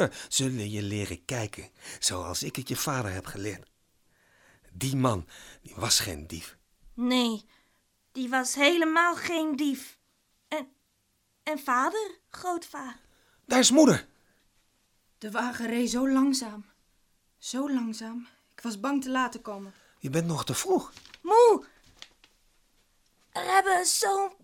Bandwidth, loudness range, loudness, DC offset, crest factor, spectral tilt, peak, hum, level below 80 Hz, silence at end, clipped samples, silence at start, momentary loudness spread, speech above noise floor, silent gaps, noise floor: 19 kHz; 7 LU; -27 LUFS; under 0.1%; 22 dB; -3.5 dB/octave; -6 dBFS; none; -60 dBFS; 0.1 s; under 0.1%; 0 s; 19 LU; 45 dB; none; -72 dBFS